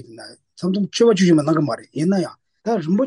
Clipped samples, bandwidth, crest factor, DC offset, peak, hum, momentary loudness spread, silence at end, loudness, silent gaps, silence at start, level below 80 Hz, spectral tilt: under 0.1%; 11 kHz; 14 dB; under 0.1%; -4 dBFS; none; 15 LU; 0 s; -19 LUFS; none; 0.1 s; -64 dBFS; -6.5 dB/octave